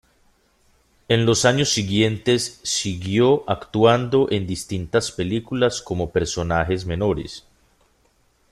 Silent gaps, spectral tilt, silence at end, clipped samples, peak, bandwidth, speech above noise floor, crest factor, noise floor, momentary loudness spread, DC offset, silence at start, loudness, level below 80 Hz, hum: none; -4.5 dB/octave; 1.15 s; under 0.1%; -2 dBFS; 13.5 kHz; 41 dB; 20 dB; -62 dBFS; 8 LU; under 0.1%; 1.1 s; -21 LUFS; -46 dBFS; none